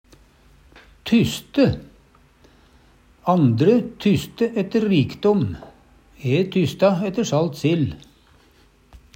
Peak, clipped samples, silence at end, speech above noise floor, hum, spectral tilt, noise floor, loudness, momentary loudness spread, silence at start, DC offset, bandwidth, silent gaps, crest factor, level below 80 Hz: -4 dBFS; under 0.1%; 1.2 s; 36 dB; none; -7 dB/octave; -55 dBFS; -20 LUFS; 10 LU; 1.05 s; under 0.1%; 16 kHz; none; 18 dB; -50 dBFS